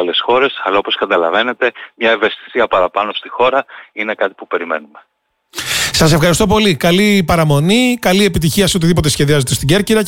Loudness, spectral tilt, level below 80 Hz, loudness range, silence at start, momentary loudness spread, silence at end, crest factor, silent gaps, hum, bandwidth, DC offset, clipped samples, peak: -13 LUFS; -4.5 dB/octave; -34 dBFS; 6 LU; 0 s; 8 LU; 0 s; 12 dB; none; none; 17 kHz; under 0.1%; under 0.1%; -2 dBFS